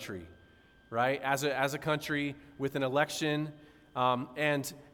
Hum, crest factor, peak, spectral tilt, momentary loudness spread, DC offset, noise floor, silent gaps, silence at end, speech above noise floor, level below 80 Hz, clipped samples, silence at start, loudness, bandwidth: none; 18 dB; -14 dBFS; -4.5 dB/octave; 9 LU; under 0.1%; -61 dBFS; none; 0.05 s; 28 dB; -66 dBFS; under 0.1%; 0 s; -32 LUFS; 18 kHz